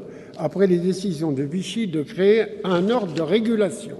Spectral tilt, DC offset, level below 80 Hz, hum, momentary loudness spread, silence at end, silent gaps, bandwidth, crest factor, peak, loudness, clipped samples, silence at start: -6.5 dB/octave; under 0.1%; -62 dBFS; none; 8 LU; 0 s; none; 12 kHz; 16 dB; -6 dBFS; -22 LUFS; under 0.1%; 0 s